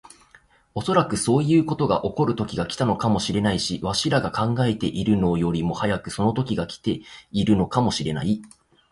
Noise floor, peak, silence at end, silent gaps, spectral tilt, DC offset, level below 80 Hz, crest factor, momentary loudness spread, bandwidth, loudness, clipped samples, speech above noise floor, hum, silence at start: -56 dBFS; -6 dBFS; 0.45 s; none; -6 dB/octave; under 0.1%; -46 dBFS; 18 dB; 7 LU; 11.5 kHz; -23 LUFS; under 0.1%; 34 dB; none; 0.75 s